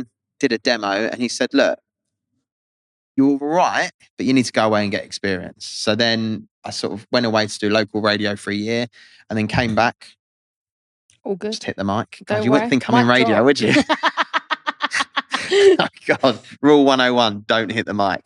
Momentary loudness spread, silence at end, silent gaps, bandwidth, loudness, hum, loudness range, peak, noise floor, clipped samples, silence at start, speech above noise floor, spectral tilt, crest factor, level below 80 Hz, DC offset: 12 LU; 0.05 s; 2.52-3.15 s, 3.94-3.99 s, 4.10-4.17 s, 6.51-6.62 s, 10.19-11.09 s; 11.5 kHz; -18 LUFS; none; 6 LU; -2 dBFS; -80 dBFS; under 0.1%; 0 s; 62 dB; -4.5 dB/octave; 18 dB; -56 dBFS; under 0.1%